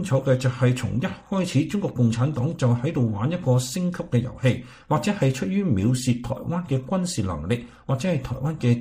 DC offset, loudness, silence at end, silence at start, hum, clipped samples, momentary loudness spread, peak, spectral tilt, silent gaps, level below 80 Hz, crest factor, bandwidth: under 0.1%; -24 LUFS; 0 s; 0 s; none; under 0.1%; 6 LU; -8 dBFS; -6.5 dB/octave; none; -48 dBFS; 16 dB; 15.5 kHz